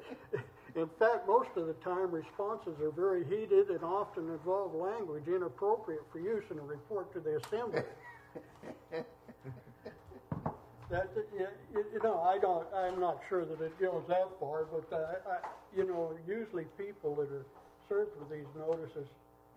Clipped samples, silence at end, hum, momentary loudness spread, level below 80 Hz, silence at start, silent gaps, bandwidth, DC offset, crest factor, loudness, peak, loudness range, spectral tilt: under 0.1%; 0.45 s; none; 19 LU; -68 dBFS; 0 s; none; 14 kHz; under 0.1%; 20 dB; -36 LUFS; -16 dBFS; 8 LU; -7.5 dB/octave